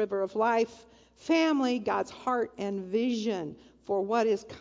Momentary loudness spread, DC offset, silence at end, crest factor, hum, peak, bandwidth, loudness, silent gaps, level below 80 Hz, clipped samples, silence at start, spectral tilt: 9 LU; under 0.1%; 0 s; 16 dB; none; -14 dBFS; 7.8 kHz; -29 LUFS; none; -68 dBFS; under 0.1%; 0 s; -5 dB/octave